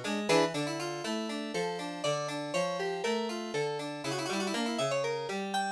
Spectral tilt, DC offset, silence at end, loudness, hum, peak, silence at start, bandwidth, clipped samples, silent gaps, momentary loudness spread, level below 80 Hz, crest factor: -4 dB/octave; under 0.1%; 0 s; -33 LUFS; none; -14 dBFS; 0 s; 11 kHz; under 0.1%; none; 7 LU; -80 dBFS; 20 dB